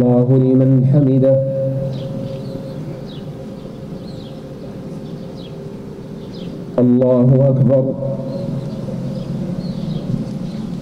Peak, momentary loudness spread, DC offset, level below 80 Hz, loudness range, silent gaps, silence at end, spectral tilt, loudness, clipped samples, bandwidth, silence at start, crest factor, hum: -4 dBFS; 18 LU; under 0.1%; -44 dBFS; 14 LU; none; 0 s; -10.5 dB/octave; -17 LUFS; under 0.1%; 6.2 kHz; 0 s; 14 dB; none